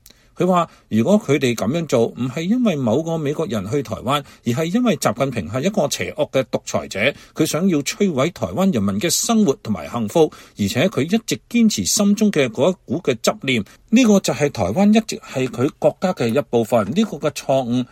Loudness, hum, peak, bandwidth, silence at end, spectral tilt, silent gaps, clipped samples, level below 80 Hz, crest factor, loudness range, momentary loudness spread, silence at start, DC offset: -19 LUFS; none; -2 dBFS; 16.5 kHz; 0.05 s; -5 dB/octave; none; under 0.1%; -54 dBFS; 18 dB; 3 LU; 7 LU; 0.4 s; under 0.1%